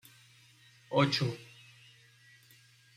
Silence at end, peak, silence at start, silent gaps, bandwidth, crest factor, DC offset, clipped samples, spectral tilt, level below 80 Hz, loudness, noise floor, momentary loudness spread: 1.5 s; -14 dBFS; 0.9 s; none; 15.5 kHz; 24 dB; under 0.1%; under 0.1%; -5.5 dB/octave; -74 dBFS; -31 LUFS; -62 dBFS; 26 LU